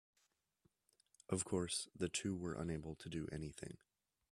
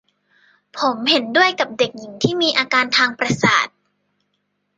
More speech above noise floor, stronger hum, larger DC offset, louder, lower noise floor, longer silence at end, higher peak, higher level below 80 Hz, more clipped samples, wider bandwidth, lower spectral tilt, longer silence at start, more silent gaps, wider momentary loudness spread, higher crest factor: second, 39 dB vs 53 dB; second, none vs 50 Hz at -45 dBFS; neither; second, -44 LUFS vs -17 LUFS; first, -83 dBFS vs -71 dBFS; second, 0.55 s vs 1.1 s; second, -24 dBFS vs -2 dBFS; second, -68 dBFS vs -58 dBFS; neither; first, 13.5 kHz vs 9.6 kHz; about the same, -4.5 dB/octave vs -3.5 dB/octave; first, 1.3 s vs 0.75 s; neither; first, 11 LU vs 7 LU; about the same, 22 dB vs 18 dB